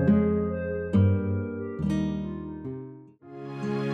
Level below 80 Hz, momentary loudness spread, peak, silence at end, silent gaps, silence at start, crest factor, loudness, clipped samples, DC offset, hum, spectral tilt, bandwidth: -48 dBFS; 17 LU; -10 dBFS; 0 s; none; 0 s; 16 dB; -28 LUFS; under 0.1%; under 0.1%; none; -9.5 dB/octave; 6.6 kHz